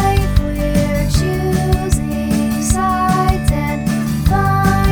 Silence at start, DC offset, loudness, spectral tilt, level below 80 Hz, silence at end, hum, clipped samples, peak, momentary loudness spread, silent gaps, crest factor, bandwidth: 0 s; under 0.1%; -16 LUFS; -6 dB/octave; -22 dBFS; 0 s; none; under 0.1%; 0 dBFS; 4 LU; none; 14 dB; over 20 kHz